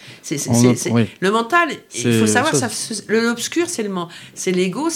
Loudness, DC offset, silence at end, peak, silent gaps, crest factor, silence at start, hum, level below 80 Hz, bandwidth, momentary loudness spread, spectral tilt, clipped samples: -18 LUFS; under 0.1%; 0 s; 0 dBFS; none; 18 dB; 0 s; none; -62 dBFS; 16.5 kHz; 10 LU; -4.5 dB/octave; under 0.1%